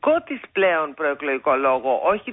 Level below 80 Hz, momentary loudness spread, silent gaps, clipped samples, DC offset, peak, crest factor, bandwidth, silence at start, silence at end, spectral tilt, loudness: -60 dBFS; 5 LU; none; under 0.1%; under 0.1%; -8 dBFS; 14 dB; 3.9 kHz; 0.05 s; 0 s; -9 dB/octave; -21 LUFS